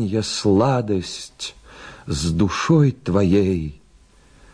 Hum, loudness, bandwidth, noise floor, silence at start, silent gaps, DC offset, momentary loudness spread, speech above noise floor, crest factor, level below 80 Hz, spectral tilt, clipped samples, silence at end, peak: none; -19 LUFS; 10.5 kHz; -51 dBFS; 0 s; none; under 0.1%; 16 LU; 32 dB; 14 dB; -42 dBFS; -6 dB/octave; under 0.1%; 0.8 s; -6 dBFS